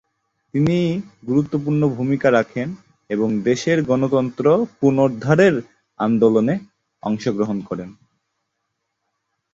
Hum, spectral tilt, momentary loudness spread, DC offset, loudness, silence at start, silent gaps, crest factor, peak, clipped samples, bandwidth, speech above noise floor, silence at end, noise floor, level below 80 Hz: none; -7.5 dB/octave; 12 LU; under 0.1%; -19 LUFS; 0.55 s; none; 18 dB; -2 dBFS; under 0.1%; 7.8 kHz; 57 dB; 1.6 s; -76 dBFS; -56 dBFS